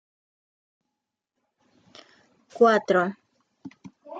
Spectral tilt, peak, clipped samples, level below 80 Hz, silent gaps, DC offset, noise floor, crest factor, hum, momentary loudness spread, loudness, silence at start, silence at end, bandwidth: -6 dB/octave; -6 dBFS; under 0.1%; -78 dBFS; none; under 0.1%; -84 dBFS; 22 dB; none; 26 LU; -22 LUFS; 2.55 s; 0 s; 7.8 kHz